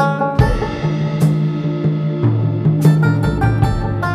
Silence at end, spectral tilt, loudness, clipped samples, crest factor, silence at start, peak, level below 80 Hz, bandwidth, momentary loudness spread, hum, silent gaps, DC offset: 0 s; -8.5 dB/octave; -16 LUFS; under 0.1%; 14 dB; 0 s; 0 dBFS; -28 dBFS; 13 kHz; 6 LU; none; none; under 0.1%